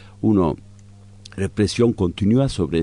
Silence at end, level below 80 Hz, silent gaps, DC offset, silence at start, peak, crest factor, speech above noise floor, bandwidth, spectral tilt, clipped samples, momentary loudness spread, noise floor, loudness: 0 s; -44 dBFS; none; under 0.1%; 0.05 s; -6 dBFS; 14 dB; 25 dB; 11 kHz; -7 dB/octave; under 0.1%; 10 LU; -44 dBFS; -20 LUFS